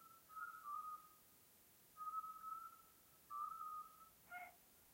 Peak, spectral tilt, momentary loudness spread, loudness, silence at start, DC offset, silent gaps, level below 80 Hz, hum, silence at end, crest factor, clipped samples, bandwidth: -38 dBFS; -2 dB/octave; 18 LU; -53 LUFS; 0 s; under 0.1%; none; -88 dBFS; none; 0 s; 16 dB; under 0.1%; 16 kHz